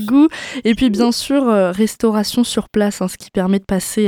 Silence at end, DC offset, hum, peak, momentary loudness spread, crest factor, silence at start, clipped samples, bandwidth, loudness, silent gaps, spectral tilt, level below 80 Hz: 0 s; under 0.1%; none; -2 dBFS; 6 LU; 14 dB; 0 s; under 0.1%; over 20 kHz; -16 LUFS; none; -5 dB/octave; -44 dBFS